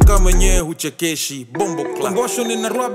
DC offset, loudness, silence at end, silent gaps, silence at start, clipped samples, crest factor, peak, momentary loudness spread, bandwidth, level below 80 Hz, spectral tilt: under 0.1%; -19 LUFS; 0 s; none; 0 s; under 0.1%; 14 dB; -2 dBFS; 7 LU; 16 kHz; -18 dBFS; -4.5 dB/octave